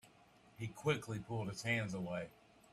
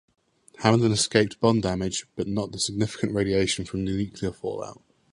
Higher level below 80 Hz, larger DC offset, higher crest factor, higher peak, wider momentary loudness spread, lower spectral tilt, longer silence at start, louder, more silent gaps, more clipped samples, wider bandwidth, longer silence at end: second, -70 dBFS vs -50 dBFS; neither; about the same, 20 dB vs 24 dB; second, -22 dBFS vs -2 dBFS; about the same, 11 LU vs 10 LU; about the same, -5.5 dB/octave vs -5 dB/octave; second, 0.05 s vs 0.6 s; second, -41 LUFS vs -25 LUFS; neither; neither; first, 14 kHz vs 11.5 kHz; about the same, 0.4 s vs 0.4 s